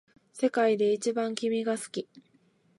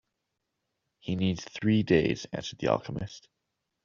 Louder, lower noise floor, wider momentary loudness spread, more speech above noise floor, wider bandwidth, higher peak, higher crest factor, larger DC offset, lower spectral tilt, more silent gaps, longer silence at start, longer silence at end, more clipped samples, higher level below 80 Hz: about the same, -28 LUFS vs -29 LUFS; second, -66 dBFS vs -83 dBFS; about the same, 13 LU vs 14 LU; second, 38 dB vs 54 dB; first, 11.5 kHz vs 7.4 kHz; about the same, -12 dBFS vs -10 dBFS; second, 16 dB vs 22 dB; neither; about the same, -4.5 dB/octave vs -5.5 dB/octave; neither; second, 0.35 s vs 1.05 s; about the same, 0.75 s vs 0.65 s; neither; second, -84 dBFS vs -58 dBFS